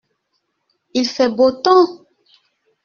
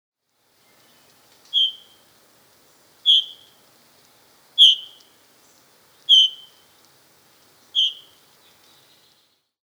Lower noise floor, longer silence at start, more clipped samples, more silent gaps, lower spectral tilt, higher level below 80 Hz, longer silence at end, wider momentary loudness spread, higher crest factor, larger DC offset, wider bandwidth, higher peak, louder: first, -71 dBFS vs -65 dBFS; second, 0.95 s vs 1.55 s; neither; neither; first, -2 dB/octave vs 3 dB/octave; first, -62 dBFS vs -84 dBFS; second, 0.9 s vs 1.75 s; second, 8 LU vs 17 LU; second, 16 dB vs 22 dB; neither; second, 7 kHz vs over 20 kHz; about the same, -2 dBFS vs -4 dBFS; about the same, -15 LUFS vs -16 LUFS